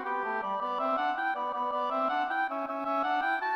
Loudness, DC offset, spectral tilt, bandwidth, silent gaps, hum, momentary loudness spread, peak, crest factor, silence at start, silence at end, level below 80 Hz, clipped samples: -30 LUFS; under 0.1%; -4.5 dB/octave; 13 kHz; none; none; 3 LU; -20 dBFS; 12 dB; 0 s; 0 s; -74 dBFS; under 0.1%